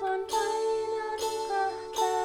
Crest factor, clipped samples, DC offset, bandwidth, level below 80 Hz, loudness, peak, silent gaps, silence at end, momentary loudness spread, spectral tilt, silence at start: 14 dB; under 0.1%; under 0.1%; 19 kHz; -64 dBFS; -30 LUFS; -16 dBFS; none; 0 s; 3 LU; -1.5 dB/octave; 0 s